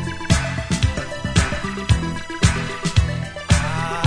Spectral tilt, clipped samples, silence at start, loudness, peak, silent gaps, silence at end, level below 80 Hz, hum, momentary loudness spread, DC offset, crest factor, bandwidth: -4.5 dB/octave; under 0.1%; 0 s; -21 LUFS; -2 dBFS; none; 0 s; -28 dBFS; none; 6 LU; under 0.1%; 18 dB; 11 kHz